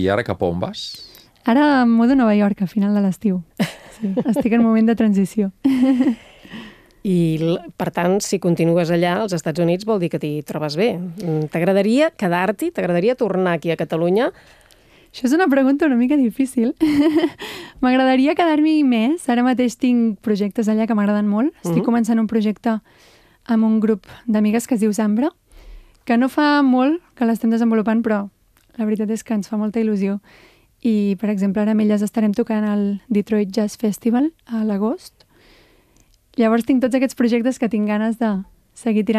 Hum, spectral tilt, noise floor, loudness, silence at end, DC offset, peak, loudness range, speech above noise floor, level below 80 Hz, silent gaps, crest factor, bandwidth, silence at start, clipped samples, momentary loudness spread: none; -6.5 dB/octave; -56 dBFS; -18 LUFS; 0 s; under 0.1%; -4 dBFS; 4 LU; 38 dB; -54 dBFS; none; 14 dB; 14.5 kHz; 0 s; under 0.1%; 9 LU